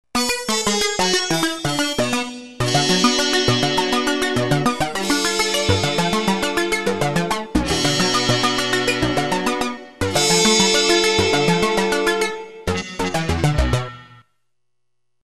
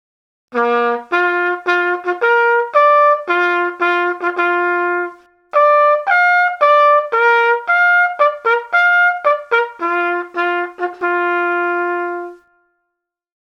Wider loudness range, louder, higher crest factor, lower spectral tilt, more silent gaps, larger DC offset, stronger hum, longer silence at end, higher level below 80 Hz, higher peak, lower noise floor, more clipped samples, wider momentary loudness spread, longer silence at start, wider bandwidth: second, 3 LU vs 6 LU; second, -18 LUFS vs -14 LUFS; about the same, 18 dB vs 14 dB; about the same, -3.5 dB/octave vs -3 dB/octave; neither; first, 1% vs under 0.1%; neither; second, 0 s vs 1.15 s; first, -36 dBFS vs -74 dBFS; about the same, -2 dBFS vs 0 dBFS; about the same, -80 dBFS vs -77 dBFS; neither; about the same, 8 LU vs 8 LU; second, 0.05 s vs 0.5 s; first, 13 kHz vs 7.4 kHz